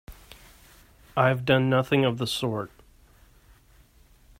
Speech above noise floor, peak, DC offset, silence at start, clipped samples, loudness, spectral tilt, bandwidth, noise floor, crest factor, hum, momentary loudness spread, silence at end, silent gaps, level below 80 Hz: 33 dB; -8 dBFS; under 0.1%; 0.1 s; under 0.1%; -24 LUFS; -6 dB/octave; 16 kHz; -57 dBFS; 20 dB; none; 11 LU; 1.75 s; none; -54 dBFS